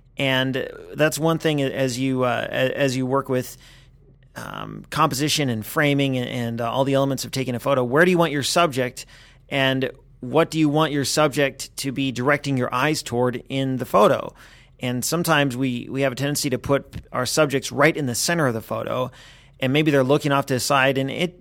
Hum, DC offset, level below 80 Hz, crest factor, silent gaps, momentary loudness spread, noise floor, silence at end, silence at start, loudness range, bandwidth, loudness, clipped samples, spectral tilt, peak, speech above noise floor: none; under 0.1%; -52 dBFS; 20 dB; none; 9 LU; -51 dBFS; 0.1 s; 0.2 s; 3 LU; 20 kHz; -21 LUFS; under 0.1%; -4.5 dB/octave; -2 dBFS; 30 dB